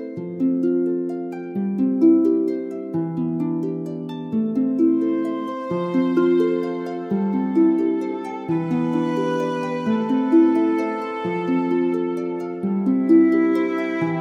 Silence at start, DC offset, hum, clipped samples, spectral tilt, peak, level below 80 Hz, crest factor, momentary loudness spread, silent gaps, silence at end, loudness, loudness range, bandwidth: 0 s; under 0.1%; none; under 0.1%; -8.5 dB/octave; -6 dBFS; -72 dBFS; 14 dB; 11 LU; none; 0 s; -21 LUFS; 2 LU; 6.2 kHz